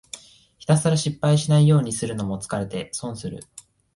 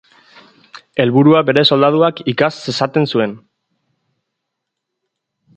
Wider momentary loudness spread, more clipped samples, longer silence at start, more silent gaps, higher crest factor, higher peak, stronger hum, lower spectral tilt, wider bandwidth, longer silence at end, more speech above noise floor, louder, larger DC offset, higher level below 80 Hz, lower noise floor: first, 18 LU vs 9 LU; neither; second, 0.15 s vs 0.95 s; neither; about the same, 18 dB vs 16 dB; second, -6 dBFS vs 0 dBFS; neither; about the same, -6 dB/octave vs -6.5 dB/octave; first, 11.5 kHz vs 8.8 kHz; second, 0.35 s vs 2.2 s; second, 29 dB vs 64 dB; second, -22 LUFS vs -14 LUFS; neither; first, -54 dBFS vs -60 dBFS; second, -50 dBFS vs -77 dBFS